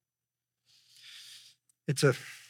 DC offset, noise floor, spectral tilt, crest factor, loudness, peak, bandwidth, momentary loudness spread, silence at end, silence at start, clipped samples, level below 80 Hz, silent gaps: under 0.1%; under -90 dBFS; -5 dB/octave; 24 dB; -30 LUFS; -12 dBFS; 16.5 kHz; 24 LU; 0.1 s; 1.15 s; under 0.1%; -86 dBFS; none